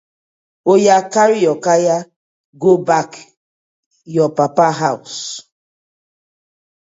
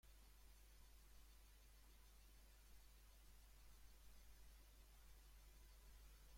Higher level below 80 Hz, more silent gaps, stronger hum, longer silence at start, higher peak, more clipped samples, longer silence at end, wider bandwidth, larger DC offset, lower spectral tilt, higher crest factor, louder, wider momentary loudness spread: about the same, -66 dBFS vs -68 dBFS; first, 2.16-2.53 s, 3.37-3.91 s vs none; neither; first, 0.65 s vs 0.05 s; first, 0 dBFS vs -54 dBFS; neither; first, 1.4 s vs 0 s; second, 8 kHz vs 16.5 kHz; neither; first, -5 dB/octave vs -3 dB/octave; about the same, 16 dB vs 12 dB; first, -15 LUFS vs -69 LUFS; first, 13 LU vs 2 LU